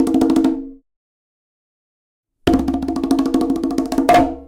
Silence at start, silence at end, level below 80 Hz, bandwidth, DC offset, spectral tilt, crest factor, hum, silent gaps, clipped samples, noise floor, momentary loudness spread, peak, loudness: 0 s; 0.05 s; -38 dBFS; 16.5 kHz; under 0.1%; -6 dB/octave; 16 dB; none; 0.96-2.23 s; under 0.1%; under -90 dBFS; 8 LU; -2 dBFS; -17 LUFS